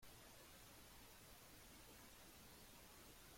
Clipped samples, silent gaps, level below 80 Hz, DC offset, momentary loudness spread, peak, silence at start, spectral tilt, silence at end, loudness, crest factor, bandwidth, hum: under 0.1%; none; -72 dBFS; under 0.1%; 0 LU; -50 dBFS; 0 s; -2.5 dB/octave; 0 s; -62 LUFS; 14 dB; 16.5 kHz; none